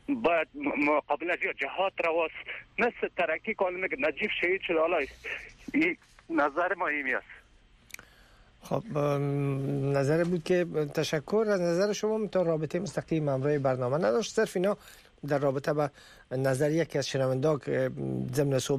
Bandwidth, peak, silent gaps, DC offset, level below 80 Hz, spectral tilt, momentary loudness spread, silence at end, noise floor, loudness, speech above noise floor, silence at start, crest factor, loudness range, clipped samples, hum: 15 kHz; -16 dBFS; none; under 0.1%; -62 dBFS; -6 dB/octave; 7 LU; 0 s; -59 dBFS; -29 LUFS; 31 dB; 0.1 s; 14 dB; 3 LU; under 0.1%; none